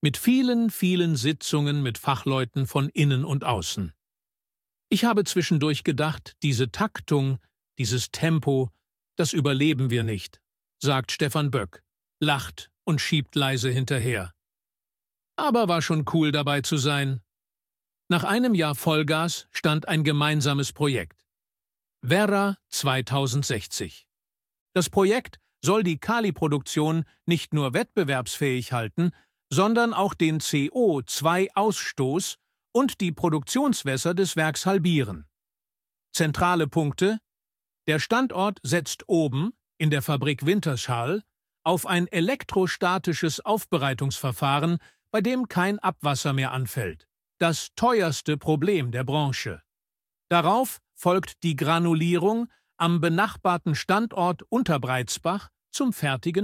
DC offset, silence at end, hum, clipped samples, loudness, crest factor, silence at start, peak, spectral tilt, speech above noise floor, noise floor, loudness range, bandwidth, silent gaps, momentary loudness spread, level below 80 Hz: under 0.1%; 0 s; none; under 0.1%; -25 LUFS; 20 dB; 0.05 s; -6 dBFS; -5 dB/octave; over 66 dB; under -90 dBFS; 2 LU; 16.5 kHz; 24.60-24.66 s; 7 LU; -58 dBFS